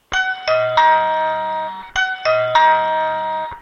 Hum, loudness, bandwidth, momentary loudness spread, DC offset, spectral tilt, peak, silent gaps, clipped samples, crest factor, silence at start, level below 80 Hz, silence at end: none; -17 LUFS; 7 kHz; 9 LU; under 0.1%; -2.5 dB/octave; -2 dBFS; none; under 0.1%; 16 dB; 0.1 s; -48 dBFS; 0 s